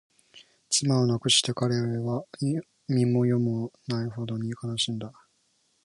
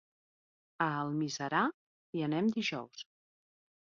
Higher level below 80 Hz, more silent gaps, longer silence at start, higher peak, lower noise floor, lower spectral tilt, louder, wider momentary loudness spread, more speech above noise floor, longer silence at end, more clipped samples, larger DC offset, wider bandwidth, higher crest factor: first, -64 dBFS vs -80 dBFS; second, none vs 1.74-2.13 s; second, 0.35 s vs 0.8 s; first, -8 dBFS vs -16 dBFS; second, -70 dBFS vs under -90 dBFS; about the same, -4.5 dB/octave vs -4 dB/octave; first, -27 LUFS vs -34 LUFS; second, 11 LU vs 14 LU; second, 43 dB vs over 56 dB; about the same, 0.75 s vs 0.85 s; neither; neither; first, 11.5 kHz vs 7.4 kHz; about the same, 20 dB vs 20 dB